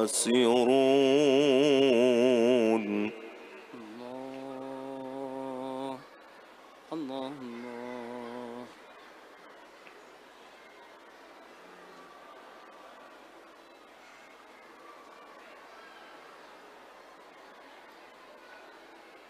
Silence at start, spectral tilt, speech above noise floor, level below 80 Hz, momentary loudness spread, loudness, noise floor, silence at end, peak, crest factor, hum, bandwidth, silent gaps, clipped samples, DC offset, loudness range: 0 s; -4 dB/octave; 30 dB; -80 dBFS; 28 LU; -28 LUFS; -54 dBFS; 0.3 s; -14 dBFS; 18 dB; none; 15 kHz; none; under 0.1%; under 0.1%; 26 LU